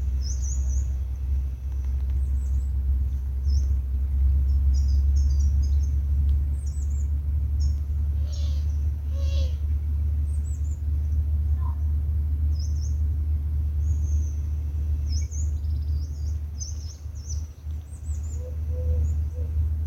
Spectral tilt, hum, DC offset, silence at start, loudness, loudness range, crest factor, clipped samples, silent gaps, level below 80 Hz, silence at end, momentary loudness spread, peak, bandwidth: -6.5 dB/octave; none; under 0.1%; 0 s; -27 LUFS; 6 LU; 10 dB; under 0.1%; none; -24 dBFS; 0 s; 8 LU; -14 dBFS; 7.8 kHz